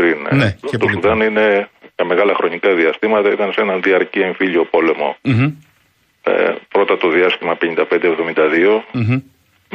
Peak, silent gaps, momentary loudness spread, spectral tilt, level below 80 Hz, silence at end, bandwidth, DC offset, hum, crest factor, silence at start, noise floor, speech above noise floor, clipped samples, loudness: -2 dBFS; none; 5 LU; -7.5 dB/octave; -52 dBFS; 0.55 s; 9 kHz; under 0.1%; none; 14 dB; 0 s; -58 dBFS; 43 dB; under 0.1%; -15 LUFS